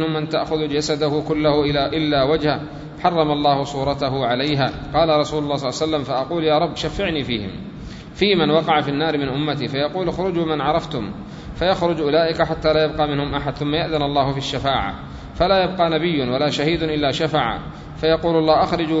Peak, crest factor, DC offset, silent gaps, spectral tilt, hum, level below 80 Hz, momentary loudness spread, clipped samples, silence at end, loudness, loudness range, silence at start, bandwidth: -2 dBFS; 18 dB; under 0.1%; none; -6 dB/octave; none; -40 dBFS; 7 LU; under 0.1%; 0 s; -20 LUFS; 2 LU; 0 s; 8 kHz